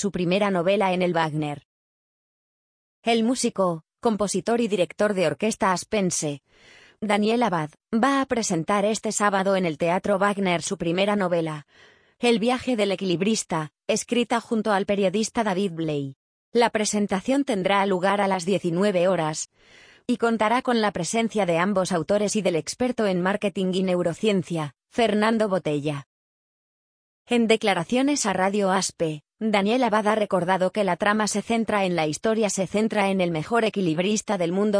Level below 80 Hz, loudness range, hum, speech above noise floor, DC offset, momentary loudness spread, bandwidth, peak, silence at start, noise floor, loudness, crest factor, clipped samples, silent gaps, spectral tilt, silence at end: -60 dBFS; 2 LU; none; over 67 dB; under 0.1%; 6 LU; 10.5 kHz; -6 dBFS; 0 s; under -90 dBFS; -23 LUFS; 18 dB; under 0.1%; 1.65-3.02 s, 16.16-16.52 s, 26.06-27.25 s; -4.5 dB/octave; 0 s